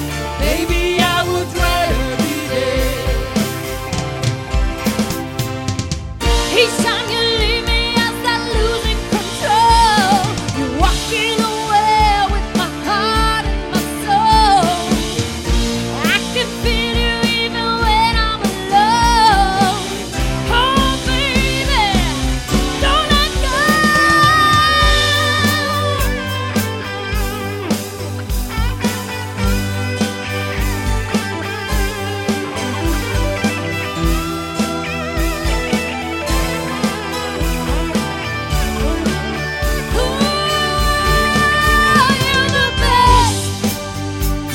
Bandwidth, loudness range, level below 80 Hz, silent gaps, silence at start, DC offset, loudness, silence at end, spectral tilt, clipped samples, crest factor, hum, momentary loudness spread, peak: 17 kHz; 7 LU; -24 dBFS; none; 0 s; under 0.1%; -16 LUFS; 0 s; -4 dB/octave; under 0.1%; 16 dB; none; 10 LU; 0 dBFS